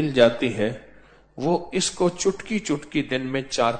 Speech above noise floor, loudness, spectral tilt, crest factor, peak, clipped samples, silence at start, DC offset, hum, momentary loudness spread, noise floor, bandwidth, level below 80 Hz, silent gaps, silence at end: 28 dB; -24 LUFS; -4.5 dB/octave; 20 dB; -4 dBFS; under 0.1%; 0 s; under 0.1%; none; 9 LU; -51 dBFS; 9.4 kHz; -52 dBFS; none; 0 s